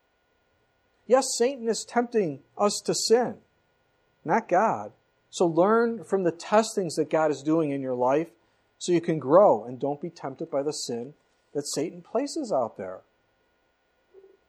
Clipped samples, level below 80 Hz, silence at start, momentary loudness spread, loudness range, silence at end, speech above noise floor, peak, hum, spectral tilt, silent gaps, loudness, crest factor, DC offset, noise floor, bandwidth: under 0.1%; -78 dBFS; 1.1 s; 14 LU; 7 LU; 1.5 s; 45 dB; -6 dBFS; none; -4.5 dB/octave; none; -26 LUFS; 22 dB; under 0.1%; -70 dBFS; 14.5 kHz